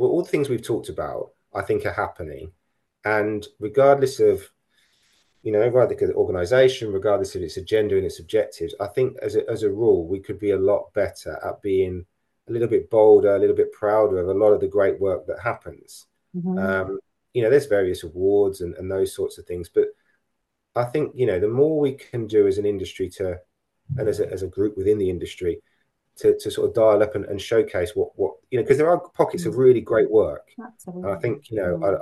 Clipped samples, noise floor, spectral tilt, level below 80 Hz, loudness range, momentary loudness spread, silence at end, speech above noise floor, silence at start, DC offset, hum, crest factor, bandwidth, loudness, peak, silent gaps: under 0.1%; -77 dBFS; -6.5 dB/octave; -54 dBFS; 5 LU; 13 LU; 0 s; 56 dB; 0 s; under 0.1%; none; 18 dB; 12.5 kHz; -22 LUFS; -2 dBFS; none